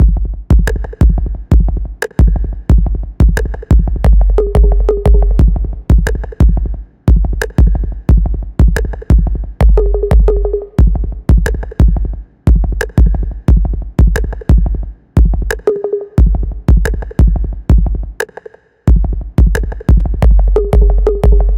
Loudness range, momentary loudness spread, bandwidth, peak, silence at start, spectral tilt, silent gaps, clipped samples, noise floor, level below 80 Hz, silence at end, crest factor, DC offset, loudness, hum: 2 LU; 7 LU; 9.2 kHz; 0 dBFS; 0 s; -8 dB/octave; none; under 0.1%; -35 dBFS; -10 dBFS; 0 s; 10 dB; under 0.1%; -14 LUFS; none